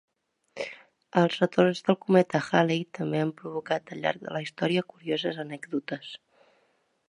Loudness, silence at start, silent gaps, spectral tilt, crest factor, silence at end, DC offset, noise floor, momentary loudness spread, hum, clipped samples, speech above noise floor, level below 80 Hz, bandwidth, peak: -28 LUFS; 0.55 s; none; -6.5 dB/octave; 22 dB; 0.9 s; under 0.1%; -70 dBFS; 15 LU; none; under 0.1%; 43 dB; -74 dBFS; 10.5 kHz; -6 dBFS